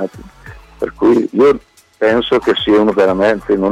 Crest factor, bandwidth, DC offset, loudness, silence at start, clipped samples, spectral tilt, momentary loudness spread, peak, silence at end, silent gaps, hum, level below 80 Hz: 10 dB; 10.5 kHz; under 0.1%; -13 LUFS; 0 s; under 0.1%; -6 dB/octave; 10 LU; -4 dBFS; 0 s; none; none; -42 dBFS